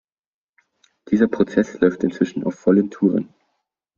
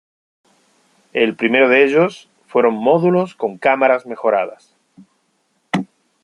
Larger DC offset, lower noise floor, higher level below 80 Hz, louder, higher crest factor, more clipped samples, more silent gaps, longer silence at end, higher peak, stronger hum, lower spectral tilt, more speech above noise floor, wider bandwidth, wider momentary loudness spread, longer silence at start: neither; first, -75 dBFS vs -65 dBFS; first, -58 dBFS vs -66 dBFS; second, -20 LUFS vs -16 LUFS; about the same, 18 dB vs 16 dB; neither; neither; first, 0.7 s vs 0.4 s; about the same, -2 dBFS vs -2 dBFS; neither; first, -8 dB/octave vs -6.5 dB/octave; first, 56 dB vs 50 dB; second, 7.2 kHz vs 10.5 kHz; second, 5 LU vs 11 LU; about the same, 1.1 s vs 1.15 s